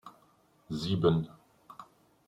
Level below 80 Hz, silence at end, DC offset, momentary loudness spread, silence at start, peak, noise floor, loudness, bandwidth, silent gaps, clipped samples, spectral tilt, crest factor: -62 dBFS; 0.45 s; under 0.1%; 24 LU; 0.05 s; -12 dBFS; -66 dBFS; -31 LUFS; 10.5 kHz; none; under 0.1%; -7.5 dB/octave; 22 dB